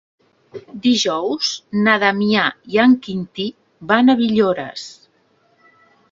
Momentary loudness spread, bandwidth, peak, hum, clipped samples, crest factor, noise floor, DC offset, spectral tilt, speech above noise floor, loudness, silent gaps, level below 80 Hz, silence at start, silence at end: 19 LU; 7.6 kHz; 0 dBFS; none; under 0.1%; 18 dB; -59 dBFS; under 0.1%; -4.5 dB/octave; 42 dB; -17 LUFS; none; -62 dBFS; 0.55 s; 1.2 s